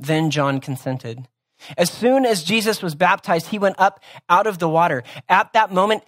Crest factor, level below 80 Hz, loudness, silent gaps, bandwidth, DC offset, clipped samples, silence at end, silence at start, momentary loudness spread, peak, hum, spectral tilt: 18 dB; -66 dBFS; -19 LUFS; none; 16 kHz; under 0.1%; under 0.1%; 0.1 s; 0 s; 10 LU; 0 dBFS; none; -4.5 dB/octave